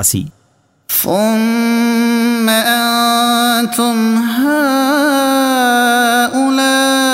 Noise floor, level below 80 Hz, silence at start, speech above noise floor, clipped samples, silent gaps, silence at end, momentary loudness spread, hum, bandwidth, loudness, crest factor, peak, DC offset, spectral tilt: -55 dBFS; -52 dBFS; 0 s; 43 dB; under 0.1%; none; 0 s; 3 LU; none; 16.5 kHz; -12 LUFS; 12 dB; 0 dBFS; under 0.1%; -3 dB/octave